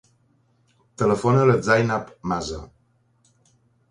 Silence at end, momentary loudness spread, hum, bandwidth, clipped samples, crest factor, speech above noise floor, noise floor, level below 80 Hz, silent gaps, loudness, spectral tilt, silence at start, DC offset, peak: 1.25 s; 12 LU; none; 11 kHz; under 0.1%; 20 dB; 43 dB; -63 dBFS; -50 dBFS; none; -21 LUFS; -6.5 dB/octave; 1 s; under 0.1%; -4 dBFS